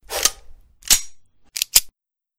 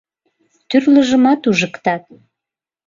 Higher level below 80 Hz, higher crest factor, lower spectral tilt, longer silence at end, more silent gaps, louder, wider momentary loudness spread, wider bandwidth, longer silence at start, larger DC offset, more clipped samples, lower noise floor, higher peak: first, -42 dBFS vs -58 dBFS; first, 24 dB vs 16 dB; second, 2 dB/octave vs -5 dB/octave; second, 0.5 s vs 0.9 s; neither; second, -18 LUFS vs -14 LUFS; about the same, 8 LU vs 9 LU; first, over 20 kHz vs 7.6 kHz; second, 0.1 s vs 0.7 s; neither; neither; second, -56 dBFS vs -86 dBFS; about the same, 0 dBFS vs -2 dBFS